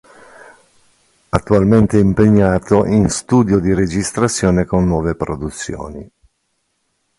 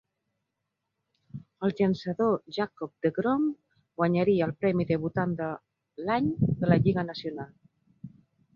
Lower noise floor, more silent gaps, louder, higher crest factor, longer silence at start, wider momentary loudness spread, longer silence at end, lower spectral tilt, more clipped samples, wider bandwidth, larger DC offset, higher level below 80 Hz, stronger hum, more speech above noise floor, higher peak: second, -67 dBFS vs -83 dBFS; neither; first, -15 LUFS vs -28 LUFS; about the same, 16 dB vs 20 dB; about the same, 1.35 s vs 1.35 s; second, 13 LU vs 18 LU; first, 1.15 s vs 0.45 s; second, -6.5 dB/octave vs -9 dB/octave; neither; first, 11.5 kHz vs 6.8 kHz; neither; first, -34 dBFS vs -58 dBFS; neither; about the same, 53 dB vs 56 dB; first, 0 dBFS vs -8 dBFS